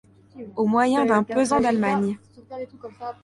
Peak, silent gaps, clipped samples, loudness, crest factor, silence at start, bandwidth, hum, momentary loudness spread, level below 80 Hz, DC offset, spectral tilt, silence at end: -6 dBFS; none; under 0.1%; -21 LUFS; 16 dB; 0.35 s; 11.5 kHz; none; 18 LU; -58 dBFS; under 0.1%; -6 dB/octave; 0.1 s